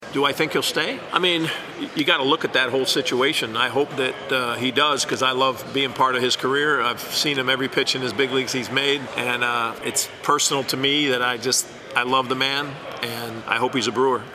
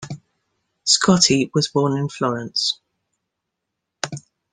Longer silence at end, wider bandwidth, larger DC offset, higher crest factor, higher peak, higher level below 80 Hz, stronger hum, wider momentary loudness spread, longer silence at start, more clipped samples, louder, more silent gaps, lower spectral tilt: second, 0 s vs 0.35 s; first, 15.5 kHz vs 10 kHz; neither; about the same, 20 dB vs 22 dB; about the same, -2 dBFS vs 0 dBFS; second, -64 dBFS vs -58 dBFS; neither; second, 5 LU vs 17 LU; about the same, 0 s vs 0 s; neither; second, -21 LUFS vs -18 LUFS; neither; about the same, -2.5 dB/octave vs -3.5 dB/octave